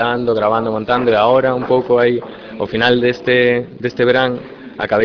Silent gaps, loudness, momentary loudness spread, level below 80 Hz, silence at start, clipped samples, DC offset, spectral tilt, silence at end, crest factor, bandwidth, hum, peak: none; -15 LUFS; 11 LU; -48 dBFS; 0 s; under 0.1%; under 0.1%; -7 dB/octave; 0 s; 14 dB; 5.4 kHz; none; 0 dBFS